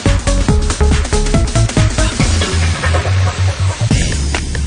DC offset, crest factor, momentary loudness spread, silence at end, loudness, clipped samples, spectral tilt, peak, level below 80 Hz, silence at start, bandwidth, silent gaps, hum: under 0.1%; 12 dB; 2 LU; 0 s; -14 LUFS; under 0.1%; -5 dB/octave; 0 dBFS; -18 dBFS; 0 s; 10.5 kHz; none; none